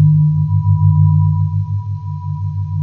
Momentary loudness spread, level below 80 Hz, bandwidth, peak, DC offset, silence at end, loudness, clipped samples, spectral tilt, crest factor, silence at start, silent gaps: 11 LU; -44 dBFS; 1.1 kHz; -2 dBFS; under 0.1%; 0 s; -15 LUFS; under 0.1%; -12.5 dB/octave; 12 dB; 0 s; none